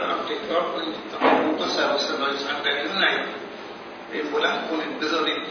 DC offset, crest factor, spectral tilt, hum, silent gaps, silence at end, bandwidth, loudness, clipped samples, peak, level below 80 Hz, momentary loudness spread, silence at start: under 0.1%; 20 dB; -3 dB/octave; none; none; 0 s; 6.8 kHz; -24 LUFS; under 0.1%; -4 dBFS; -68 dBFS; 12 LU; 0 s